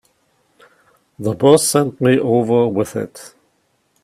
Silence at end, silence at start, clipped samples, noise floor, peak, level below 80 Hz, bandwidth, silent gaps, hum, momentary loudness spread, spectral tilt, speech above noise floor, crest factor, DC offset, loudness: 0.75 s; 1.2 s; under 0.1%; -63 dBFS; 0 dBFS; -58 dBFS; 15.5 kHz; none; none; 13 LU; -5 dB/octave; 48 dB; 18 dB; under 0.1%; -16 LUFS